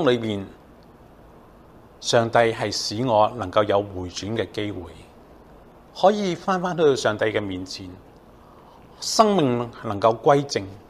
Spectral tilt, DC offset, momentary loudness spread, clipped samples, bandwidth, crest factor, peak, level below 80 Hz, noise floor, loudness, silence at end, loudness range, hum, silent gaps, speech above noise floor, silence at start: -4.5 dB/octave; under 0.1%; 14 LU; under 0.1%; 14.5 kHz; 20 dB; -2 dBFS; -54 dBFS; -48 dBFS; -22 LUFS; 0.1 s; 3 LU; none; none; 27 dB; 0 s